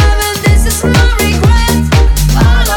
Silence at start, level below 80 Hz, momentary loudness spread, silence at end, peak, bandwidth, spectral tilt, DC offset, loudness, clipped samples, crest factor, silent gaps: 0 s; -10 dBFS; 1 LU; 0 s; 0 dBFS; 18.5 kHz; -5 dB/octave; under 0.1%; -10 LUFS; under 0.1%; 8 dB; none